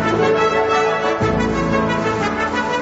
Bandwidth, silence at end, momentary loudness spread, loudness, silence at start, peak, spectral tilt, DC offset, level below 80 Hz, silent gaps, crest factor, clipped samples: 8 kHz; 0 s; 4 LU; -17 LUFS; 0 s; -4 dBFS; -5.5 dB/octave; under 0.1%; -38 dBFS; none; 14 dB; under 0.1%